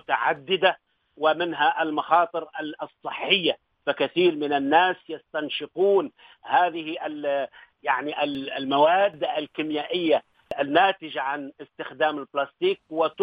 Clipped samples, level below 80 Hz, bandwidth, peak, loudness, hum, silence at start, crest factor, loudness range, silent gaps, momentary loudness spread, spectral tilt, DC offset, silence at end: under 0.1%; -72 dBFS; 5 kHz; -4 dBFS; -24 LUFS; none; 0.1 s; 20 dB; 2 LU; none; 13 LU; -7 dB/octave; under 0.1%; 0 s